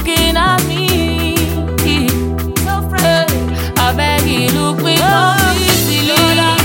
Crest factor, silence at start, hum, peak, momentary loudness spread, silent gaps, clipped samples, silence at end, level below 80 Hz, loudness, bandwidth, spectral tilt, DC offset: 12 dB; 0 s; none; 0 dBFS; 6 LU; none; under 0.1%; 0 s; -28 dBFS; -13 LUFS; 17 kHz; -4 dB/octave; under 0.1%